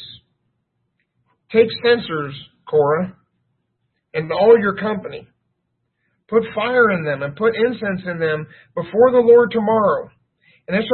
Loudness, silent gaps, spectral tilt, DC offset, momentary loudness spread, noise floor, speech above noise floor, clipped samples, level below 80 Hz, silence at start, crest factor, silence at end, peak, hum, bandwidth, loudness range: -17 LUFS; none; -11 dB/octave; under 0.1%; 16 LU; -72 dBFS; 56 dB; under 0.1%; -58 dBFS; 0 s; 18 dB; 0 s; -2 dBFS; none; 4.4 kHz; 4 LU